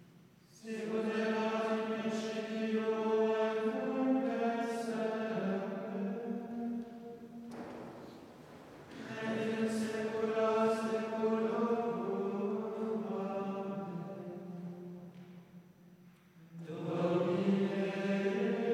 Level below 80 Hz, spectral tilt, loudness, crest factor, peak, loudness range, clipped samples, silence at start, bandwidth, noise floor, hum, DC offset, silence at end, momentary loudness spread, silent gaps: -80 dBFS; -6.5 dB/octave; -35 LUFS; 16 dB; -20 dBFS; 9 LU; under 0.1%; 0 s; 12.5 kHz; -61 dBFS; none; under 0.1%; 0 s; 17 LU; none